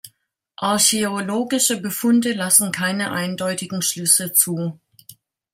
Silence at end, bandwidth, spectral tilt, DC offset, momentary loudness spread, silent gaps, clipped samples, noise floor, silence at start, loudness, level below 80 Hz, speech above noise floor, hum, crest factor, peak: 0.4 s; 16.5 kHz; -2.5 dB/octave; under 0.1%; 9 LU; none; under 0.1%; -61 dBFS; 0.05 s; -18 LUFS; -66 dBFS; 41 dB; none; 20 dB; 0 dBFS